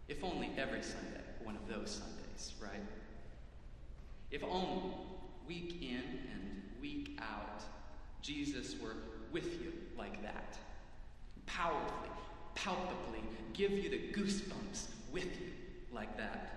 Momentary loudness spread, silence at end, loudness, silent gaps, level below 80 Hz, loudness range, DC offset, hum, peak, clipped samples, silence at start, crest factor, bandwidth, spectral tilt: 17 LU; 0 s; -44 LUFS; none; -54 dBFS; 6 LU; under 0.1%; none; -24 dBFS; under 0.1%; 0 s; 20 dB; 12 kHz; -4.5 dB/octave